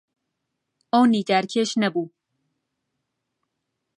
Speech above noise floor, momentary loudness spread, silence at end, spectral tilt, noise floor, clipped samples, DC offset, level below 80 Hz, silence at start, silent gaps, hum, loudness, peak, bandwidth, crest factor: 59 dB; 10 LU; 1.9 s; -5 dB/octave; -80 dBFS; under 0.1%; under 0.1%; -78 dBFS; 0.95 s; none; none; -21 LUFS; -6 dBFS; 11 kHz; 20 dB